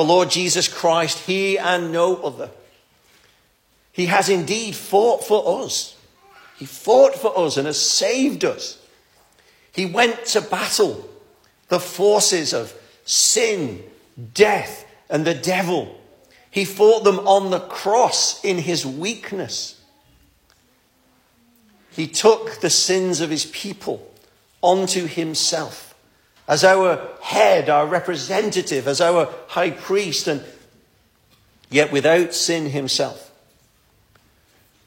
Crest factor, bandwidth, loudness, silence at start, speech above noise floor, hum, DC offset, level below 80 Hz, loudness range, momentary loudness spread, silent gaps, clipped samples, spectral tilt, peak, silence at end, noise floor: 20 dB; 16.5 kHz; -19 LUFS; 0 s; 42 dB; none; under 0.1%; -66 dBFS; 4 LU; 14 LU; none; under 0.1%; -3 dB/octave; -2 dBFS; 1.65 s; -60 dBFS